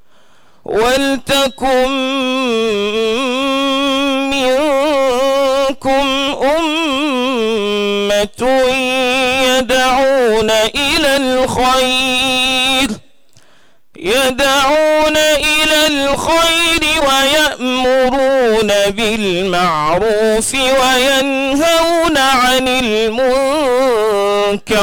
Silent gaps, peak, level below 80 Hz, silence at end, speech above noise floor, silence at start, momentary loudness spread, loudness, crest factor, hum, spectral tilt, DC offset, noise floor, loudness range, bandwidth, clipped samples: none; -6 dBFS; -38 dBFS; 0 s; 40 dB; 0.7 s; 5 LU; -12 LUFS; 6 dB; none; -2.5 dB/octave; 0.8%; -52 dBFS; 3 LU; 19.5 kHz; under 0.1%